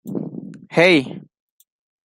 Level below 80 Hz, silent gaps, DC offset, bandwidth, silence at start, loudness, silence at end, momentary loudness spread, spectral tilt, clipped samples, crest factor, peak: -64 dBFS; none; under 0.1%; 16 kHz; 0.05 s; -17 LUFS; 0.9 s; 22 LU; -5.5 dB/octave; under 0.1%; 20 dB; -2 dBFS